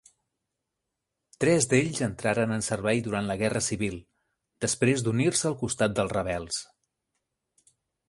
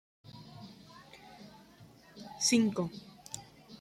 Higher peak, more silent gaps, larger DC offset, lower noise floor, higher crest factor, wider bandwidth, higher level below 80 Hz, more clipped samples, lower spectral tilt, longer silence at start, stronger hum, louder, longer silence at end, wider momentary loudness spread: first, -8 dBFS vs -16 dBFS; neither; neither; first, -84 dBFS vs -58 dBFS; about the same, 20 dB vs 22 dB; second, 11.5 kHz vs 15 kHz; first, -56 dBFS vs -72 dBFS; neither; about the same, -4.5 dB/octave vs -3.5 dB/octave; first, 1.4 s vs 0.35 s; neither; first, -27 LUFS vs -32 LUFS; first, 1.45 s vs 0.05 s; second, 8 LU vs 26 LU